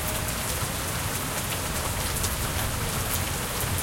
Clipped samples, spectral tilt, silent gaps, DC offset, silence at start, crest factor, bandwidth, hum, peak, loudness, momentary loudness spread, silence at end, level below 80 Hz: under 0.1%; -3 dB/octave; none; under 0.1%; 0 s; 16 dB; 17 kHz; none; -12 dBFS; -27 LUFS; 1 LU; 0 s; -38 dBFS